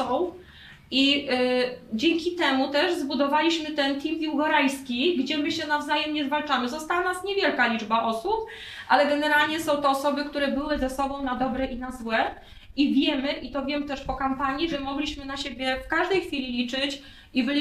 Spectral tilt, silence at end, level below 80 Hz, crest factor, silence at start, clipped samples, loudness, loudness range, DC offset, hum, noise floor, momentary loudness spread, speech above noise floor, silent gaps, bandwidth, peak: -3.5 dB/octave; 0 s; -50 dBFS; 20 dB; 0 s; under 0.1%; -25 LUFS; 4 LU; under 0.1%; none; -48 dBFS; 8 LU; 23 dB; none; 15 kHz; -6 dBFS